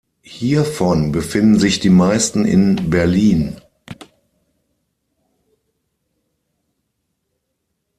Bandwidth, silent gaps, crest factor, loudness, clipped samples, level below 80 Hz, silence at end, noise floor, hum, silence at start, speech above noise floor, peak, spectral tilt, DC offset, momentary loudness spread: 13 kHz; none; 16 dB; -15 LUFS; under 0.1%; -44 dBFS; 4.05 s; -73 dBFS; none; 0.3 s; 59 dB; -2 dBFS; -5.5 dB/octave; under 0.1%; 12 LU